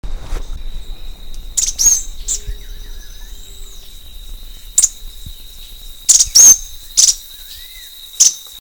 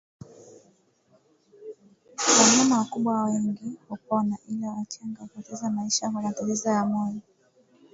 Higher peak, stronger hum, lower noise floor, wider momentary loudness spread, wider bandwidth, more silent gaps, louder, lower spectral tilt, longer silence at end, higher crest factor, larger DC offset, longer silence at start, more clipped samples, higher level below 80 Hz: first, 0 dBFS vs -4 dBFS; neither; second, -35 dBFS vs -64 dBFS; first, 28 LU vs 23 LU; first, over 20 kHz vs 8 kHz; neither; first, -10 LUFS vs -24 LUFS; second, 1.5 dB/octave vs -3 dB/octave; second, 0 s vs 0.75 s; second, 16 dB vs 22 dB; first, 0.9% vs under 0.1%; second, 0.05 s vs 0.3 s; first, 0.5% vs under 0.1%; first, -28 dBFS vs -70 dBFS